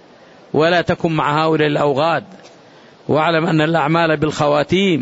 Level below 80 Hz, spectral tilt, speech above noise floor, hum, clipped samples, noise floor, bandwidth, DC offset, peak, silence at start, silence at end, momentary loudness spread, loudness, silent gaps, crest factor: -50 dBFS; -6.5 dB/octave; 29 dB; none; under 0.1%; -44 dBFS; 8 kHz; under 0.1%; -4 dBFS; 0.55 s; 0 s; 4 LU; -16 LUFS; none; 14 dB